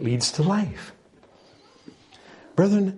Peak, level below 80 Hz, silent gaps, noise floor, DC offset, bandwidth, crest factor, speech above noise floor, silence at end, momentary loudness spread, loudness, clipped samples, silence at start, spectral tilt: -6 dBFS; -60 dBFS; none; -55 dBFS; under 0.1%; 11.5 kHz; 20 dB; 33 dB; 0 s; 18 LU; -23 LUFS; under 0.1%; 0 s; -5.5 dB/octave